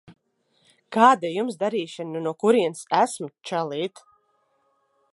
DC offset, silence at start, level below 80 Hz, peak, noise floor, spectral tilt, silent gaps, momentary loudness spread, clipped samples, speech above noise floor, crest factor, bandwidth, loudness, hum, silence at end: under 0.1%; 0.1 s; -78 dBFS; -2 dBFS; -68 dBFS; -4.5 dB/octave; none; 13 LU; under 0.1%; 46 dB; 22 dB; 11.5 kHz; -23 LUFS; none; 1.25 s